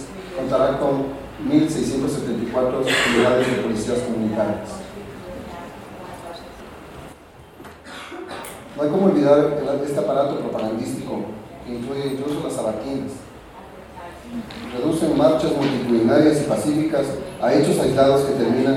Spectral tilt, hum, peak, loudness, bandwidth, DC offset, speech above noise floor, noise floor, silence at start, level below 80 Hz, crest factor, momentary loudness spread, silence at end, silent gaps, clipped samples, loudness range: -5.5 dB/octave; none; -2 dBFS; -20 LUFS; 16 kHz; under 0.1%; 24 dB; -44 dBFS; 0 s; -48 dBFS; 18 dB; 21 LU; 0 s; none; under 0.1%; 12 LU